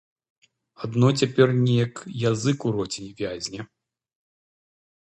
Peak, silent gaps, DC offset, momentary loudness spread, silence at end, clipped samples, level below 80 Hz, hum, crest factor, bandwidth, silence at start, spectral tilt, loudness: -4 dBFS; none; under 0.1%; 14 LU; 1.4 s; under 0.1%; -60 dBFS; none; 22 dB; 8.8 kHz; 0.8 s; -6 dB/octave; -24 LUFS